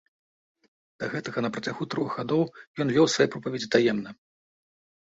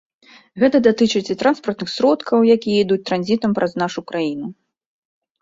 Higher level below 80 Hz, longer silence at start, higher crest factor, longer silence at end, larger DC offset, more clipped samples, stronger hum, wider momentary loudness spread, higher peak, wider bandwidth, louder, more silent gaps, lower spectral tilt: second, -66 dBFS vs -60 dBFS; first, 1 s vs 0.55 s; first, 22 dB vs 16 dB; about the same, 1 s vs 0.9 s; neither; neither; neither; about the same, 11 LU vs 9 LU; second, -6 dBFS vs -2 dBFS; about the same, 8 kHz vs 7.8 kHz; second, -27 LUFS vs -18 LUFS; first, 2.67-2.75 s vs none; about the same, -5 dB/octave vs -5.5 dB/octave